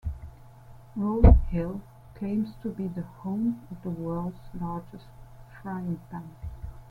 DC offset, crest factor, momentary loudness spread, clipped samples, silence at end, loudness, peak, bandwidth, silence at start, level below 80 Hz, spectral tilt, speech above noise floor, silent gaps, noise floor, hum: under 0.1%; 24 dB; 21 LU; under 0.1%; 0.05 s; -29 LUFS; -4 dBFS; 4.5 kHz; 0.05 s; -30 dBFS; -10.5 dB/octave; 22 dB; none; -49 dBFS; none